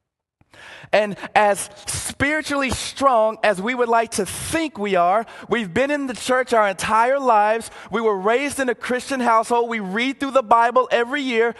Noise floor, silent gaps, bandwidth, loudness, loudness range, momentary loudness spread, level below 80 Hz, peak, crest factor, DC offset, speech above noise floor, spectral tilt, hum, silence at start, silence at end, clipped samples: -65 dBFS; none; 12.5 kHz; -20 LUFS; 1 LU; 7 LU; -50 dBFS; 0 dBFS; 20 dB; under 0.1%; 45 dB; -3.5 dB/octave; none; 0.6 s; 0 s; under 0.1%